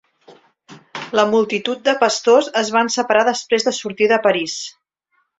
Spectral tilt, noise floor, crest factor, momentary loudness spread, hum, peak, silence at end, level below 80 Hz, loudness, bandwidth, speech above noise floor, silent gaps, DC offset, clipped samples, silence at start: -2.5 dB/octave; -67 dBFS; 18 dB; 11 LU; none; 0 dBFS; 0.7 s; -64 dBFS; -17 LUFS; 8 kHz; 50 dB; none; under 0.1%; under 0.1%; 0.3 s